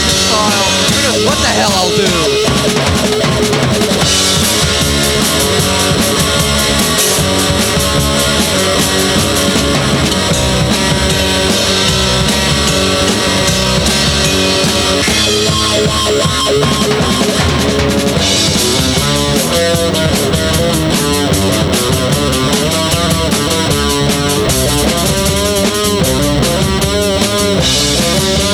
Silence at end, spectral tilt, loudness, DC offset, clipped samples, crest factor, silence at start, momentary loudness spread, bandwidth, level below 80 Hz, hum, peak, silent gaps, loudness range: 0 s; -3.5 dB/octave; -11 LUFS; under 0.1%; under 0.1%; 12 dB; 0 s; 2 LU; over 20 kHz; -26 dBFS; none; 0 dBFS; none; 1 LU